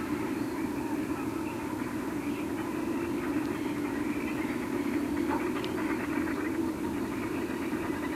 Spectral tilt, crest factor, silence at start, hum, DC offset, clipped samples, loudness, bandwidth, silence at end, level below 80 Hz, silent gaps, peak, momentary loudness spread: -6 dB/octave; 14 dB; 0 s; none; under 0.1%; under 0.1%; -32 LUFS; 16 kHz; 0 s; -56 dBFS; none; -18 dBFS; 3 LU